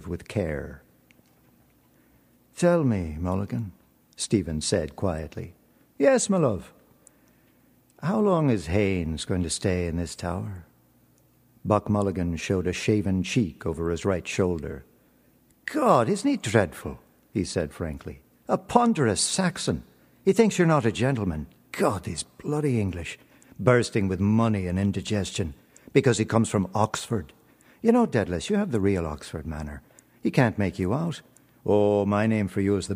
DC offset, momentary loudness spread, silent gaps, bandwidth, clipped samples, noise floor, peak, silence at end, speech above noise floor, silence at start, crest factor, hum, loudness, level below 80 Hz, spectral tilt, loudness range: under 0.1%; 14 LU; none; 15.5 kHz; under 0.1%; -61 dBFS; -2 dBFS; 0 s; 36 dB; 0 s; 24 dB; none; -25 LUFS; -48 dBFS; -5.5 dB/octave; 4 LU